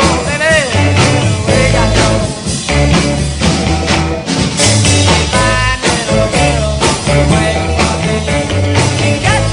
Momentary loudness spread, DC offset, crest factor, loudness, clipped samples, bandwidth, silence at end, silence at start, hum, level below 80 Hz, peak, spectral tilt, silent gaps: 4 LU; under 0.1%; 10 dB; -11 LUFS; under 0.1%; 11 kHz; 0 s; 0 s; none; -22 dBFS; 0 dBFS; -4.5 dB/octave; none